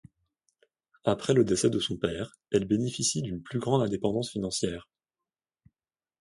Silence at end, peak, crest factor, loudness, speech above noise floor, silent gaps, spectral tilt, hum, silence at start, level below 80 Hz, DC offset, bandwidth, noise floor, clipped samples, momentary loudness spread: 1.35 s; -10 dBFS; 20 dB; -28 LUFS; over 62 dB; none; -5 dB/octave; none; 1.05 s; -58 dBFS; under 0.1%; 11.5 kHz; under -90 dBFS; under 0.1%; 8 LU